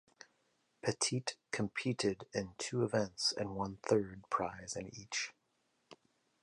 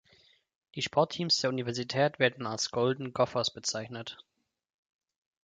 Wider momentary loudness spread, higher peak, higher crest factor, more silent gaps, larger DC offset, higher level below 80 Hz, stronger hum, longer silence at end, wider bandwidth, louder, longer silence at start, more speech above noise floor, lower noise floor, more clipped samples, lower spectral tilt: second, 7 LU vs 14 LU; second, -18 dBFS vs -10 dBFS; about the same, 22 dB vs 24 dB; neither; neither; about the same, -68 dBFS vs -70 dBFS; neither; second, 0.5 s vs 1.25 s; first, 11 kHz vs 9.6 kHz; second, -37 LUFS vs -30 LUFS; about the same, 0.85 s vs 0.75 s; first, 42 dB vs 34 dB; first, -79 dBFS vs -65 dBFS; neither; about the same, -4 dB/octave vs -3.5 dB/octave